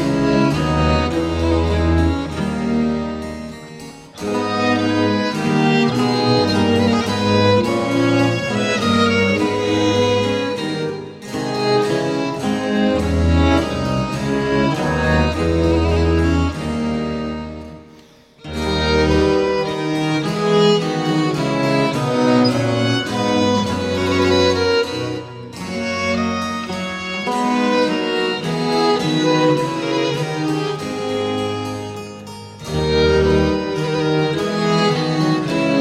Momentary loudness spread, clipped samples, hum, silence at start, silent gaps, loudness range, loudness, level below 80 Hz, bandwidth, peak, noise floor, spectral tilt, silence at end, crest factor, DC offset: 10 LU; under 0.1%; none; 0 s; none; 4 LU; -18 LUFS; -32 dBFS; 14.5 kHz; -2 dBFS; -46 dBFS; -6 dB/octave; 0 s; 16 dB; under 0.1%